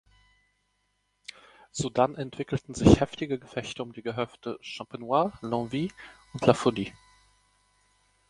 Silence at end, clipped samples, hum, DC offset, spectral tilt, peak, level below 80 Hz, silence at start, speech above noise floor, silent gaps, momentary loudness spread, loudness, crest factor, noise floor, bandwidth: 1.4 s; under 0.1%; 50 Hz at -55 dBFS; under 0.1%; -6 dB/octave; -4 dBFS; -48 dBFS; 1.75 s; 47 dB; none; 18 LU; -28 LUFS; 26 dB; -74 dBFS; 11.5 kHz